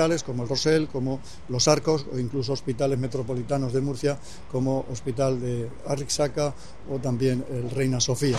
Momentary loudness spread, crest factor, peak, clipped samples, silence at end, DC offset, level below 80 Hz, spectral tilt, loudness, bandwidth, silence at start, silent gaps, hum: 9 LU; 22 dB; -4 dBFS; under 0.1%; 0 s; 1%; -50 dBFS; -5 dB/octave; -26 LUFS; 13 kHz; 0 s; none; none